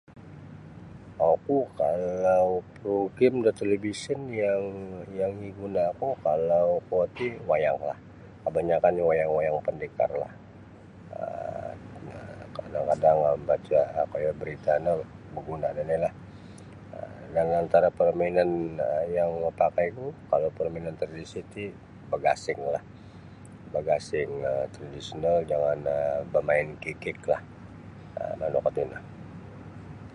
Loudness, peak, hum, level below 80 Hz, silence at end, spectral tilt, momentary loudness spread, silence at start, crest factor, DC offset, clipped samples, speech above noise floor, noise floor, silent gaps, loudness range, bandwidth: -27 LUFS; -8 dBFS; none; -56 dBFS; 0 s; -7 dB/octave; 20 LU; 0.1 s; 20 dB; under 0.1%; under 0.1%; 21 dB; -48 dBFS; none; 5 LU; 11 kHz